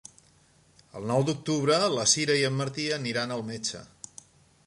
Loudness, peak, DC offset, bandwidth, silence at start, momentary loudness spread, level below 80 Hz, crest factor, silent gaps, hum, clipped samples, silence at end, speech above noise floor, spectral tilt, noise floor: -26 LUFS; -8 dBFS; under 0.1%; 11.5 kHz; 0.95 s; 21 LU; -66 dBFS; 20 dB; none; none; under 0.1%; 0.8 s; 34 dB; -3.5 dB/octave; -61 dBFS